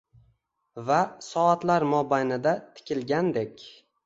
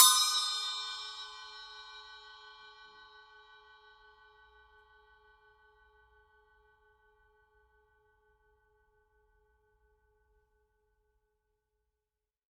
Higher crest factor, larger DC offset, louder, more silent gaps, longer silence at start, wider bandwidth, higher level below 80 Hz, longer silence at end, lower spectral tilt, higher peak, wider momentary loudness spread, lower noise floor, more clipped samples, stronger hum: second, 18 dB vs 34 dB; neither; first, -26 LUFS vs -30 LUFS; neither; first, 0.75 s vs 0 s; second, 8 kHz vs 15.5 kHz; first, -70 dBFS vs -76 dBFS; second, 0.35 s vs 10.25 s; first, -6 dB/octave vs 5 dB/octave; about the same, -8 dBFS vs -6 dBFS; second, 13 LU vs 28 LU; second, -69 dBFS vs under -90 dBFS; neither; neither